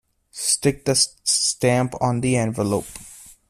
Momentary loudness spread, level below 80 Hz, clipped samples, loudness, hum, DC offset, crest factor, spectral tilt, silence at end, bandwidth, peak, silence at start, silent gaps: 18 LU; -52 dBFS; under 0.1%; -20 LUFS; none; under 0.1%; 18 dB; -3.5 dB/octave; 0.15 s; 15 kHz; -4 dBFS; 0.35 s; none